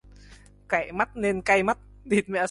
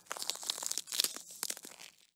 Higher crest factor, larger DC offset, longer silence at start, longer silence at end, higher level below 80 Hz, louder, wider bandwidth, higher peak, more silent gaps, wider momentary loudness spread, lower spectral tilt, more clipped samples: second, 18 dB vs 32 dB; neither; first, 0.3 s vs 0.05 s; second, 0 s vs 0.25 s; first, -52 dBFS vs -90 dBFS; first, -25 LUFS vs -36 LUFS; second, 11.5 kHz vs over 20 kHz; about the same, -8 dBFS vs -8 dBFS; neither; second, 6 LU vs 12 LU; first, -5 dB/octave vs 2 dB/octave; neither